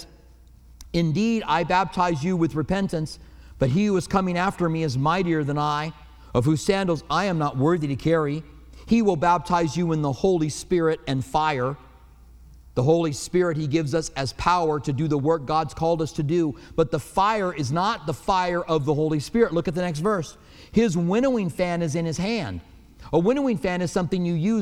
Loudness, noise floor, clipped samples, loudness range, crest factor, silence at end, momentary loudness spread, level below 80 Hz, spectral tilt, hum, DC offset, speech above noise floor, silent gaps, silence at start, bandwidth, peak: -23 LUFS; -50 dBFS; under 0.1%; 2 LU; 18 dB; 0 s; 5 LU; -46 dBFS; -6.5 dB/octave; none; under 0.1%; 27 dB; none; 0 s; 14 kHz; -6 dBFS